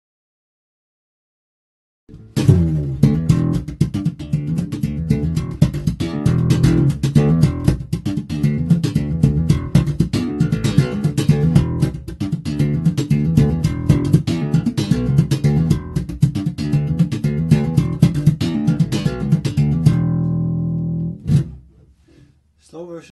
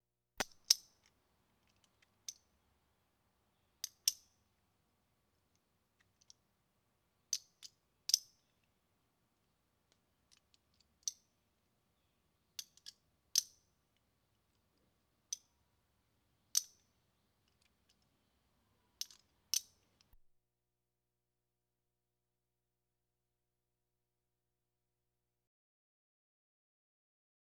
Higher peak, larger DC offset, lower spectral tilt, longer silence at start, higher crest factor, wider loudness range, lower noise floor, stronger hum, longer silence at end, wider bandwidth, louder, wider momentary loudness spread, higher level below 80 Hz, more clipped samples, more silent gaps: first, 0 dBFS vs -10 dBFS; neither; first, -8 dB/octave vs 2 dB/octave; first, 2.1 s vs 0.4 s; second, 18 dB vs 40 dB; second, 3 LU vs 10 LU; second, -52 dBFS vs -90 dBFS; second, none vs 60 Hz at -90 dBFS; second, 0.15 s vs 7.85 s; second, 12.5 kHz vs 19.5 kHz; first, -18 LUFS vs -38 LUFS; second, 8 LU vs 23 LU; first, -32 dBFS vs -82 dBFS; neither; neither